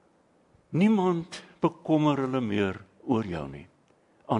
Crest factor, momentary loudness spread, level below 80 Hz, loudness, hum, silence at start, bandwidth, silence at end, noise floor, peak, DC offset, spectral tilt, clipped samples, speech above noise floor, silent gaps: 18 dB; 16 LU; -62 dBFS; -27 LUFS; none; 0.7 s; 10.5 kHz; 0 s; -64 dBFS; -10 dBFS; under 0.1%; -7.5 dB/octave; under 0.1%; 38 dB; none